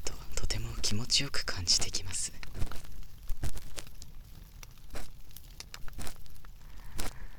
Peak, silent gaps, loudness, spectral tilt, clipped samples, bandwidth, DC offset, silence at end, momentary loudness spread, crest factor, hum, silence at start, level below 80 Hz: -12 dBFS; none; -33 LUFS; -2 dB/octave; under 0.1%; over 20 kHz; under 0.1%; 0 s; 24 LU; 18 dB; none; 0 s; -42 dBFS